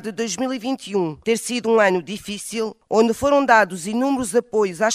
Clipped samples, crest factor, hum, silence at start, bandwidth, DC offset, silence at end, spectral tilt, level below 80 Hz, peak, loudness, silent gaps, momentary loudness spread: under 0.1%; 20 dB; none; 0 s; 15.5 kHz; under 0.1%; 0 s; -4 dB/octave; -54 dBFS; 0 dBFS; -20 LUFS; none; 10 LU